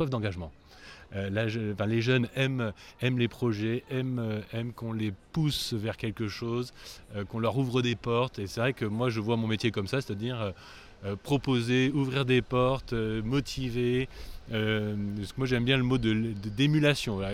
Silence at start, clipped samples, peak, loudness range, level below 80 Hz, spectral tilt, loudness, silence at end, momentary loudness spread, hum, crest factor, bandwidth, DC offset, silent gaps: 0 s; under 0.1%; -12 dBFS; 4 LU; -50 dBFS; -6.5 dB/octave; -30 LUFS; 0 s; 11 LU; none; 18 dB; 15 kHz; under 0.1%; none